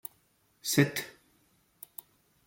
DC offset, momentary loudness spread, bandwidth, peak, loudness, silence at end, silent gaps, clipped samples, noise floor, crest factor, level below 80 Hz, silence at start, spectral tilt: under 0.1%; 21 LU; 17 kHz; -8 dBFS; -29 LUFS; 1.35 s; none; under 0.1%; -70 dBFS; 26 dB; -72 dBFS; 0.65 s; -4.5 dB/octave